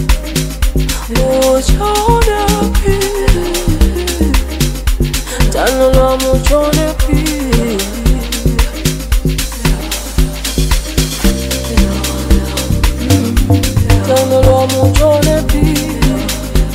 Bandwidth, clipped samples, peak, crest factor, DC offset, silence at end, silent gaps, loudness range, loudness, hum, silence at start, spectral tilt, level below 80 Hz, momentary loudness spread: 16.5 kHz; under 0.1%; 0 dBFS; 12 dB; 0.2%; 0 s; none; 4 LU; -13 LUFS; none; 0 s; -5 dB/octave; -16 dBFS; 6 LU